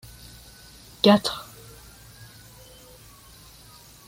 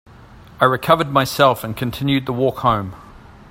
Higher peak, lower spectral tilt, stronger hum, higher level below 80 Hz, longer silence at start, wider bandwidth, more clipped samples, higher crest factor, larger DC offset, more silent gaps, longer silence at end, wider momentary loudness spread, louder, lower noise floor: second, -4 dBFS vs 0 dBFS; about the same, -5 dB/octave vs -5.5 dB/octave; neither; second, -56 dBFS vs -46 dBFS; first, 1.05 s vs 0.6 s; about the same, 16.5 kHz vs 16.5 kHz; neither; first, 24 dB vs 18 dB; neither; neither; first, 2.65 s vs 0.4 s; first, 28 LU vs 8 LU; second, -21 LUFS vs -18 LUFS; first, -49 dBFS vs -42 dBFS